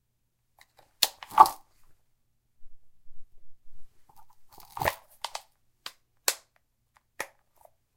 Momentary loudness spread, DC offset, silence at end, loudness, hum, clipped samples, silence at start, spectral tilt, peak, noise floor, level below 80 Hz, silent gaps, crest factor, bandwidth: 25 LU; under 0.1%; 0.7 s; -27 LUFS; none; under 0.1%; 1 s; -1 dB/octave; 0 dBFS; -75 dBFS; -58 dBFS; none; 32 dB; 17 kHz